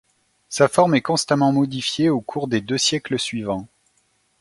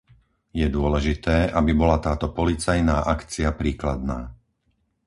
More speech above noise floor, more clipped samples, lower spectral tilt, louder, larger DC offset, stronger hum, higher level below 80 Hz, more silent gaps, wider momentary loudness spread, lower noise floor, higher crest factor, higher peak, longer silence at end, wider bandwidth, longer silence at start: about the same, 45 dB vs 48 dB; neither; second, -4.5 dB/octave vs -6.5 dB/octave; first, -20 LUFS vs -23 LUFS; neither; neither; second, -58 dBFS vs -30 dBFS; neither; about the same, 9 LU vs 9 LU; second, -65 dBFS vs -70 dBFS; about the same, 20 dB vs 18 dB; first, 0 dBFS vs -6 dBFS; about the same, 0.75 s vs 0.75 s; about the same, 11.5 kHz vs 11.5 kHz; about the same, 0.5 s vs 0.55 s